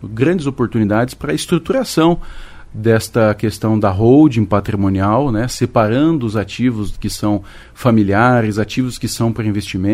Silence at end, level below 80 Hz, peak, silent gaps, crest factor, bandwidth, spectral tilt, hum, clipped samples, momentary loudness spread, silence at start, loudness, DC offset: 0 s; -36 dBFS; 0 dBFS; none; 14 dB; 15.5 kHz; -6.5 dB/octave; none; under 0.1%; 8 LU; 0 s; -15 LUFS; under 0.1%